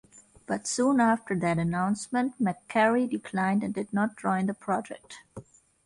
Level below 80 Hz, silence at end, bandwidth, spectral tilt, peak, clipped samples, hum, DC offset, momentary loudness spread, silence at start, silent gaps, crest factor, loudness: -62 dBFS; 0.45 s; 11.5 kHz; -5.5 dB/octave; -10 dBFS; under 0.1%; none; under 0.1%; 11 LU; 0.5 s; none; 18 dB; -27 LUFS